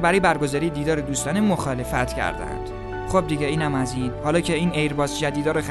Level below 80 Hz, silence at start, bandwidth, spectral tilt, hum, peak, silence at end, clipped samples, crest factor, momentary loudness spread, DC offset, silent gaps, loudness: -38 dBFS; 0 s; 12.5 kHz; -5 dB/octave; none; -6 dBFS; 0 s; under 0.1%; 16 dB; 6 LU; under 0.1%; none; -23 LUFS